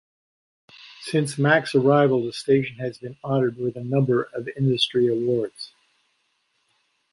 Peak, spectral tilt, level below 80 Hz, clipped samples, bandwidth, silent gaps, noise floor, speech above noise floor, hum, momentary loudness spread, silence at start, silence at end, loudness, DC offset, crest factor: -4 dBFS; -6 dB/octave; -64 dBFS; under 0.1%; 11.5 kHz; none; -70 dBFS; 48 dB; none; 13 LU; 0.85 s; 1.45 s; -22 LUFS; under 0.1%; 20 dB